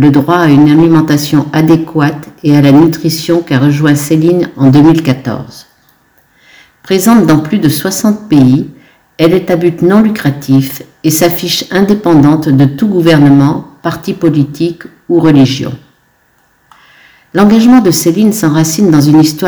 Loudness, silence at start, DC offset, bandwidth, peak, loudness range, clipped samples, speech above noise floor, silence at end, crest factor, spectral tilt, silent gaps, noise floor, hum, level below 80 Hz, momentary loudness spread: -8 LUFS; 0 s; under 0.1%; over 20 kHz; 0 dBFS; 4 LU; 5%; 44 dB; 0 s; 8 dB; -6 dB/octave; none; -52 dBFS; none; -42 dBFS; 11 LU